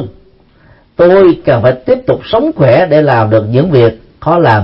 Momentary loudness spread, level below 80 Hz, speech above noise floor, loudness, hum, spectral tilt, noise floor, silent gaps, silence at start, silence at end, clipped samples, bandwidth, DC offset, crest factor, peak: 6 LU; -40 dBFS; 36 dB; -9 LUFS; none; -10 dB/octave; -44 dBFS; none; 0 s; 0 s; 0.2%; 5.8 kHz; under 0.1%; 10 dB; 0 dBFS